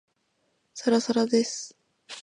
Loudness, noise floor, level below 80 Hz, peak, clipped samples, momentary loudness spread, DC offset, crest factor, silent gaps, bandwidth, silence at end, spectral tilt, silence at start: -26 LUFS; -73 dBFS; -78 dBFS; -10 dBFS; under 0.1%; 19 LU; under 0.1%; 18 dB; none; 10.5 kHz; 0 s; -3.5 dB/octave; 0.75 s